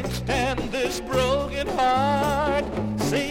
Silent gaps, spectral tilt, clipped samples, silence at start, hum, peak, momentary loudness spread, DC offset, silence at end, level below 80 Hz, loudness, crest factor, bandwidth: none; -5 dB/octave; under 0.1%; 0 s; none; -8 dBFS; 5 LU; under 0.1%; 0 s; -38 dBFS; -24 LUFS; 14 dB; 16.5 kHz